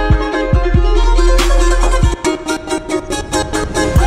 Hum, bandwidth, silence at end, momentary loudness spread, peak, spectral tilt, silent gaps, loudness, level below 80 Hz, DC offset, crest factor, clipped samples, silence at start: none; 13 kHz; 0 s; 6 LU; 0 dBFS; -5 dB/octave; none; -15 LUFS; -14 dBFS; under 0.1%; 12 dB; under 0.1%; 0 s